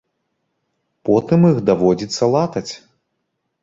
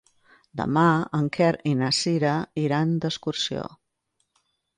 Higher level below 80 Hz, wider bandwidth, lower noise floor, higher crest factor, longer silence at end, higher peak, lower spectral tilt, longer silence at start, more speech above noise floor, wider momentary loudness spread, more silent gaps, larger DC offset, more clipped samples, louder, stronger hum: first, -54 dBFS vs -60 dBFS; second, 7.8 kHz vs 11 kHz; about the same, -73 dBFS vs -75 dBFS; about the same, 16 dB vs 16 dB; second, 0.85 s vs 1.1 s; first, -2 dBFS vs -8 dBFS; first, -7 dB/octave vs -5.5 dB/octave; first, 1.05 s vs 0.55 s; first, 58 dB vs 51 dB; first, 14 LU vs 9 LU; neither; neither; neither; first, -16 LUFS vs -24 LUFS; neither